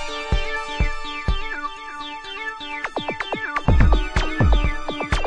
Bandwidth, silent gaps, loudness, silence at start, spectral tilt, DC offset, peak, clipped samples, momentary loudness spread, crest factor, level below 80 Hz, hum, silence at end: 9.8 kHz; none; -24 LUFS; 0 s; -5.5 dB/octave; under 0.1%; -2 dBFS; under 0.1%; 11 LU; 18 dB; -24 dBFS; none; 0 s